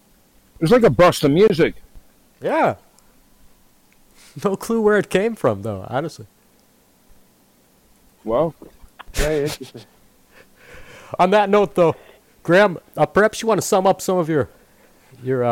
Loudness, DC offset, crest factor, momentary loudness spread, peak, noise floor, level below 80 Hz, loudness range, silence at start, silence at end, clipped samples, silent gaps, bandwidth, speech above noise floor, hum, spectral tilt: -18 LUFS; under 0.1%; 14 dB; 16 LU; -6 dBFS; -56 dBFS; -40 dBFS; 9 LU; 0.6 s; 0 s; under 0.1%; none; 17 kHz; 39 dB; none; -5.5 dB/octave